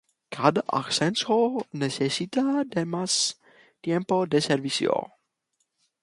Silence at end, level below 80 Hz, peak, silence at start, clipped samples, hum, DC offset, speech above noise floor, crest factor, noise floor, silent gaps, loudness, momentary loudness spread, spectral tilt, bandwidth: 1 s; -70 dBFS; -4 dBFS; 0.3 s; under 0.1%; none; under 0.1%; 51 dB; 22 dB; -76 dBFS; none; -25 LUFS; 7 LU; -4 dB/octave; 11.5 kHz